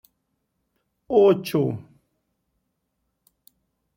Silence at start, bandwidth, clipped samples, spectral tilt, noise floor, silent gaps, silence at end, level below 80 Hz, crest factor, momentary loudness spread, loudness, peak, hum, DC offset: 1.1 s; 16.5 kHz; under 0.1%; -7.5 dB/octave; -76 dBFS; none; 2.2 s; -66 dBFS; 20 dB; 11 LU; -21 LUFS; -6 dBFS; none; under 0.1%